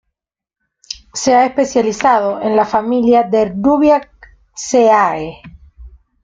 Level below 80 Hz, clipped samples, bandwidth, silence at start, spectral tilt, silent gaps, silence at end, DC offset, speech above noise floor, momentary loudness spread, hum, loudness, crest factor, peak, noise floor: -46 dBFS; under 0.1%; 9.4 kHz; 0.9 s; -4.5 dB/octave; none; 0.35 s; under 0.1%; 72 dB; 15 LU; none; -13 LUFS; 14 dB; -2 dBFS; -85 dBFS